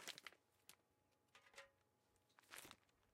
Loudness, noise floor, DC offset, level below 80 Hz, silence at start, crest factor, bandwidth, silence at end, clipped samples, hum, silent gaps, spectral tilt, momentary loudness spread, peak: -62 LUFS; -83 dBFS; under 0.1%; under -90 dBFS; 0 s; 32 dB; 16 kHz; 0 s; under 0.1%; none; none; -0.5 dB/octave; 11 LU; -32 dBFS